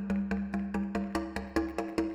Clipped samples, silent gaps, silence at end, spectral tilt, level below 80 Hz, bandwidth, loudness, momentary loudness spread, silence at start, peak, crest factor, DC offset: under 0.1%; none; 0 s; -7 dB/octave; -48 dBFS; 13 kHz; -34 LUFS; 2 LU; 0 s; -12 dBFS; 20 dB; under 0.1%